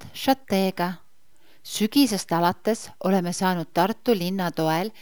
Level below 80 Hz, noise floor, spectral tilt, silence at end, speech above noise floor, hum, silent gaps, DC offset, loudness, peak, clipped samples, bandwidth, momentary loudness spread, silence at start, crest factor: -68 dBFS; -62 dBFS; -5 dB/octave; 0.1 s; 39 dB; none; none; 0.5%; -24 LUFS; -6 dBFS; under 0.1%; over 20 kHz; 6 LU; 0 s; 18 dB